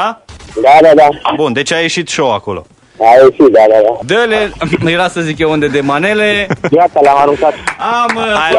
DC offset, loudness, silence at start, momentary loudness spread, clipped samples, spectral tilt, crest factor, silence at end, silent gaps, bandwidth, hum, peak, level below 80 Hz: under 0.1%; -9 LUFS; 0 s; 9 LU; 4%; -4.5 dB/octave; 10 dB; 0 s; none; 12 kHz; none; 0 dBFS; -42 dBFS